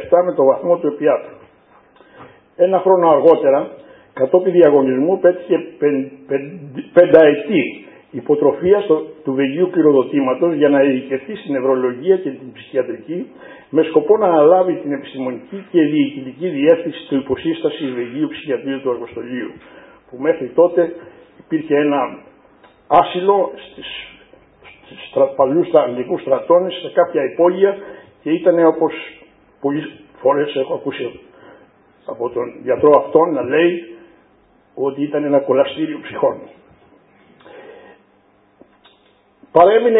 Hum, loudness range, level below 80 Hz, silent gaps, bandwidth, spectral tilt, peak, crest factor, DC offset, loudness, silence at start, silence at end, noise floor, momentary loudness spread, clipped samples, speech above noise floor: none; 6 LU; -60 dBFS; none; 4 kHz; -9.5 dB/octave; 0 dBFS; 16 dB; under 0.1%; -16 LUFS; 0 s; 0 s; -55 dBFS; 16 LU; under 0.1%; 39 dB